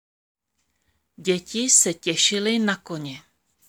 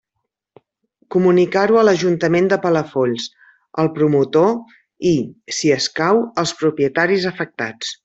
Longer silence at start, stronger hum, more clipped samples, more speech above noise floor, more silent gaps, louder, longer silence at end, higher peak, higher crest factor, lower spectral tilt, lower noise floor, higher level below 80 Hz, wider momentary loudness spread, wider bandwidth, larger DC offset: about the same, 1.2 s vs 1.1 s; neither; neither; second, 51 dB vs 60 dB; neither; second, -20 LUFS vs -17 LUFS; first, 0.5 s vs 0.1 s; about the same, -4 dBFS vs -2 dBFS; first, 22 dB vs 16 dB; second, -2 dB/octave vs -5 dB/octave; about the same, -74 dBFS vs -77 dBFS; second, -70 dBFS vs -60 dBFS; first, 17 LU vs 10 LU; first, 20 kHz vs 8.2 kHz; neither